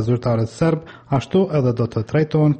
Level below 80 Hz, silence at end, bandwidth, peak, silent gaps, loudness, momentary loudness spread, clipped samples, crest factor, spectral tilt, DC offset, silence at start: -48 dBFS; 0 s; 8.8 kHz; -6 dBFS; none; -20 LUFS; 6 LU; under 0.1%; 12 dB; -8.5 dB/octave; under 0.1%; 0 s